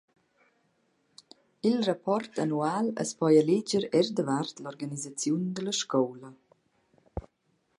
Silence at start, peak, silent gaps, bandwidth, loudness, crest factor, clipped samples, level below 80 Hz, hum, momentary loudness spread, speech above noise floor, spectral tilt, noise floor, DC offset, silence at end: 1.65 s; -10 dBFS; none; 11.5 kHz; -28 LUFS; 20 dB; under 0.1%; -60 dBFS; none; 15 LU; 45 dB; -5 dB/octave; -73 dBFS; under 0.1%; 0.6 s